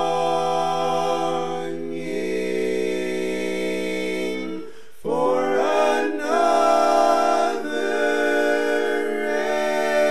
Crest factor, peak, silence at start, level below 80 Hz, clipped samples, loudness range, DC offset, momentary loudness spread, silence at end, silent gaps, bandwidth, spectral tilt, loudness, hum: 16 dB; -6 dBFS; 0 s; -64 dBFS; under 0.1%; 6 LU; 2%; 10 LU; 0 s; none; 14 kHz; -4 dB/octave; -22 LUFS; none